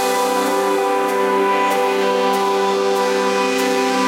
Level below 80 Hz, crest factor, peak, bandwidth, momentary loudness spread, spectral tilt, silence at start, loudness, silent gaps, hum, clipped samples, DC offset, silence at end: -66 dBFS; 12 dB; -6 dBFS; 16 kHz; 1 LU; -3 dB/octave; 0 s; -17 LUFS; none; none; under 0.1%; under 0.1%; 0 s